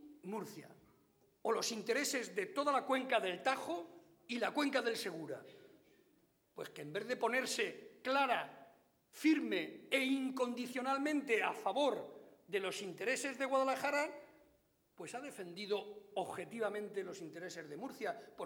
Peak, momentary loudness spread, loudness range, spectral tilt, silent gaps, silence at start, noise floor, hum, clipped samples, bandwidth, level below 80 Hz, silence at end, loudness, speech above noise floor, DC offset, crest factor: -20 dBFS; 13 LU; 6 LU; -3 dB/octave; none; 0 s; -74 dBFS; none; under 0.1%; over 20 kHz; -90 dBFS; 0 s; -38 LUFS; 36 dB; under 0.1%; 20 dB